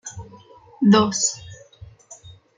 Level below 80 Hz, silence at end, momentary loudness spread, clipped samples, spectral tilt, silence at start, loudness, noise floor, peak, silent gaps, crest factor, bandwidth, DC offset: -56 dBFS; 0.45 s; 21 LU; under 0.1%; -4 dB/octave; 0.05 s; -18 LUFS; -47 dBFS; -4 dBFS; none; 18 dB; 9.6 kHz; under 0.1%